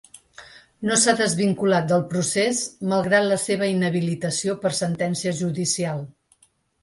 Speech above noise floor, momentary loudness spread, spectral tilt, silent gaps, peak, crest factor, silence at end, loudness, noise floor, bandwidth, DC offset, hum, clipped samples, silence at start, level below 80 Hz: 40 dB; 6 LU; -4 dB/octave; none; -4 dBFS; 18 dB; 0.7 s; -22 LUFS; -61 dBFS; 11.5 kHz; under 0.1%; none; under 0.1%; 0.4 s; -62 dBFS